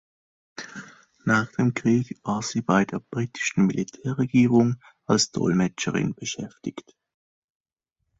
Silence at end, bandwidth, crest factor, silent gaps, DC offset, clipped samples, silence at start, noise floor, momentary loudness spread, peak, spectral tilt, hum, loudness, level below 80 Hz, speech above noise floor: 1.4 s; 8 kHz; 18 dB; none; under 0.1%; under 0.1%; 0.6 s; -81 dBFS; 16 LU; -6 dBFS; -5 dB/octave; none; -24 LUFS; -60 dBFS; 57 dB